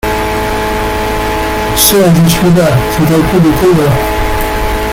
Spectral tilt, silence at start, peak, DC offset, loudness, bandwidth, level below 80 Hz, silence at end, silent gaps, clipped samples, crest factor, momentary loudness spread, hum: -5 dB/octave; 0.05 s; 0 dBFS; under 0.1%; -10 LUFS; 17 kHz; -22 dBFS; 0 s; none; 0.1%; 10 dB; 7 LU; none